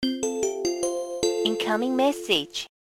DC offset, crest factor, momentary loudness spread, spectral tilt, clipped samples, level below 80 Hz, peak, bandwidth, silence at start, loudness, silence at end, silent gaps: under 0.1%; 20 dB; 5 LU; -2.5 dB/octave; under 0.1%; -60 dBFS; -6 dBFS; 16.5 kHz; 0 s; -25 LUFS; 0.25 s; none